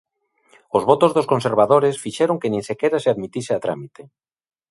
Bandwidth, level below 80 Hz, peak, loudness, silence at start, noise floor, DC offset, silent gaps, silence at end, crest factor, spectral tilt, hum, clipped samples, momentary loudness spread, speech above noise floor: 11.5 kHz; -62 dBFS; 0 dBFS; -19 LUFS; 0.75 s; -59 dBFS; under 0.1%; none; 0.65 s; 20 dB; -6 dB/octave; none; under 0.1%; 9 LU; 41 dB